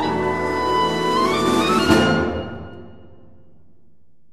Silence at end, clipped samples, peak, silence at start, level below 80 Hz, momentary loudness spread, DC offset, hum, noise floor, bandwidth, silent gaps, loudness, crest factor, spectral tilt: 1.4 s; under 0.1%; -2 dBFS; 0 s; -42 dBFS; 15 LU; 0.8%; none; -61 dBFS; 14 kHz; none; -19 LUFS; 18 dB; -5 dB/octave